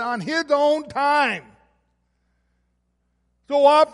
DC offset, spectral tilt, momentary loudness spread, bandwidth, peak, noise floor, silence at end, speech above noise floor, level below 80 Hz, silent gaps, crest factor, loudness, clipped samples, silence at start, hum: under 0.1%; -4 dB/octave; 9 LU; 11.5 kHz; -4 dBFS; -70 dBFS; 0.05 s; 51 dB; -66 dBFS; none; 18 dB; -19 LUFS; under 0.1%; 0 s; 60 Hz at -65 dBFS